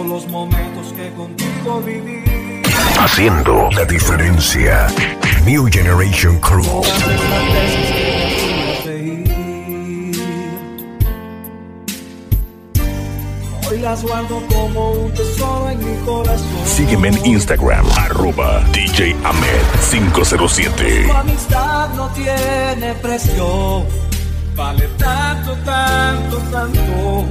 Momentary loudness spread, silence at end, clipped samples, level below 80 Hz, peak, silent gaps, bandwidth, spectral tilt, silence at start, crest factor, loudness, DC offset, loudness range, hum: 11 LU; 0 s; under 0.1%; -20 dBFS; 0 dBFS; none; 16 kHz; -4.5 dB/octave; 0 s; 14 dB; -15 LUFS; under 0.1%; 9 LU; none